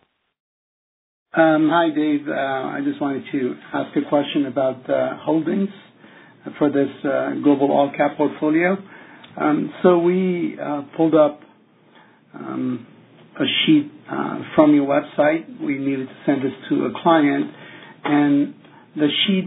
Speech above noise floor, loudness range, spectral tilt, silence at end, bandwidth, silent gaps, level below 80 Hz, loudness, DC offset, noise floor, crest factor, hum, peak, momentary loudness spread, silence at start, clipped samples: 34 dB; 3 LU; -10 dB/octave; 0 s; 4 kHz; none; -68 dBFS; -20 LUFS; under 0.1%; -53 dBFS; 20 dB; none; 0 dBFS; 11 LU; 1.35 s; under 0.1%